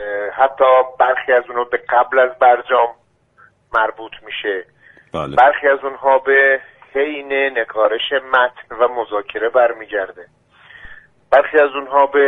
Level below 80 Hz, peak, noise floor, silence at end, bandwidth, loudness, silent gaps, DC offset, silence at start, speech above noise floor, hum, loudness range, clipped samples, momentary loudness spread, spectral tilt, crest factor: -56 dBFS; 0 dBFS; -52 dBFS; 0 s; 4.3 kHz; -16 LUFS; none; under 0.1%; 0 s; 36 dB; none; 4 LU; under 0.1%; 11 LU; -5.5 dB/octave; 16 dB